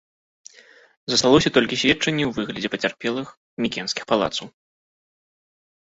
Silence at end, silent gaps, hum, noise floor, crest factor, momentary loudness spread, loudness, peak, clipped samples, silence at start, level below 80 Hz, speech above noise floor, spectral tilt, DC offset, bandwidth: 1.35 s; 3.37-3.57 s; none; -51 dBFS; 22 dB; 13 LU; -21 LUFS; -2 dBFS; under 0.1%; 1.1 s; -52 dBFS; 30 dB; -3.5 dB/octave; under 0.1%; 8 kHz